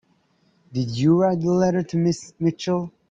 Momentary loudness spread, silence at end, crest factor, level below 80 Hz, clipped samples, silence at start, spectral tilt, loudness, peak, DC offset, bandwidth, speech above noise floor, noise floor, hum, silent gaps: 9 LU; 0.2 s; 14 dB; -58 dBFS; under 0.1%; 0.7 s; -7 dB/octave; -22 LUFS; -8 dBFS; under 0.1%; 7.8 kHz; 42 dB; -63 dBFS; none; none